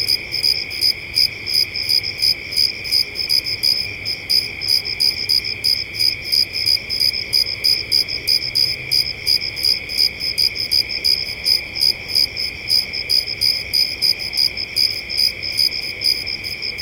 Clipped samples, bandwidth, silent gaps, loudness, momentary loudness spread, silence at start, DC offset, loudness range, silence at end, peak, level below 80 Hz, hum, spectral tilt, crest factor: under 0.1%; 17 kHz; none; -16 LUFS; 2 LU; 0 s; under 0.1%; 1 LU; 0 s; -2 dBFS; -46 dBFS; none; -0.5 dB/octave; 16 dB